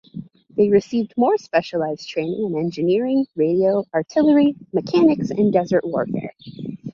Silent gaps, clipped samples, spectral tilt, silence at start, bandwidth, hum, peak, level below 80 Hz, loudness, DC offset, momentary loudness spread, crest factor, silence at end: none; under 0.1%; -7.5 dB/octave; 0.15 s; 7.2 kHz; none; -4 dBFS; -60 dBFS; -20 LUFS; under 0.1%; 12 LU; 16 dB; 0.05 s